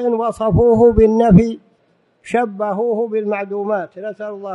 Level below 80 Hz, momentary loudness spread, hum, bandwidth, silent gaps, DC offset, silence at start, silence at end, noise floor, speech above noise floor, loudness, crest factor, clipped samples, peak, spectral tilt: -34 dBFS; 16 LU; none; 11 kHz; none; under 0.1%; 0 s; 0 s; -59 dBFS; 44 dB; -15 LUFS; 16 dB; under 0.1%; 0 dBFS; -9 dB/octave